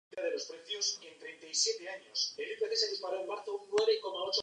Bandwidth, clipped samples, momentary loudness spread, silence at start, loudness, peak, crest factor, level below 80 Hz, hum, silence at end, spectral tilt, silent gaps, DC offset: 10.5 kHz; under 0.1%; 9 LU; 0.1 s; -34 LUFS; -16 dBFS; 20 dB; -88 dBFS; none; 0 s; 0.5 dB/octave; none; under 0.1%